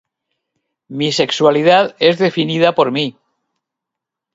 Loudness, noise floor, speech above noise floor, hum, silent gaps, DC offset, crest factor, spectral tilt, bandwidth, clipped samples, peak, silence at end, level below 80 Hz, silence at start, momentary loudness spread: -14 LUFS; -82 dBFS; 69 dB; none; none; under 0.1%; 16 dB; -5 dB/octave; 8 kHz; under 0.1%; 0 dBFS; 1.25 s; -62 dBFS; 0.9 s; 9 LU